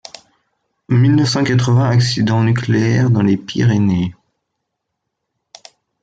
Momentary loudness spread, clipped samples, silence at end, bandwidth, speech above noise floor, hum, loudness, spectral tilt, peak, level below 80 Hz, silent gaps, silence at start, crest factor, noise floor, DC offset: 4 LU; under 0.1%; 1.9 s; 7.8 kHz; 62 dB; none; -15 LUFS; -6.5 dB/octave; -4 dBFS; -52 dBFS; none; 0.9 s; 12 dB; -76 dBFS; under 0.1%